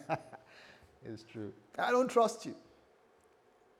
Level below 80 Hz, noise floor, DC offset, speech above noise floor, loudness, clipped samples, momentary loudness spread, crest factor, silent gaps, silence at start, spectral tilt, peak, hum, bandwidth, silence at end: -78 dBFS; -67 dBFS; under 0.1%; 33 dB; -34 LUFS; under 0.1%; 25 LU; 20 dB; none; 0 s; -4.5 dB/octave; -16 dBFS; none; 14.5 kHz; 1.2 s